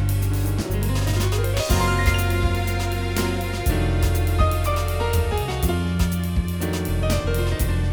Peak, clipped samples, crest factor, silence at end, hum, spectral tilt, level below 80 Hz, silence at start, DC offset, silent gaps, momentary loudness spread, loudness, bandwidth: -6 dBFS; under 0.1%; 16 dB; 0 s; none; -5.5 dB/octave; -26 dBFS; 0 s; under 0.1%; none; 4 LU; -22 LUFS; over 20 kHz